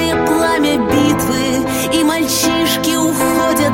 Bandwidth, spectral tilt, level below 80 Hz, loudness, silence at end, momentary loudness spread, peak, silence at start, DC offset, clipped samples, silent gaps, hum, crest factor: 17 kHz; -3.5 dB/octave; -38 dBFS; -14 LUFS; 0 s; 2 LU; -2 dBFS; 0 s; under 0.1%; under 0.1%; none; none; 12 dB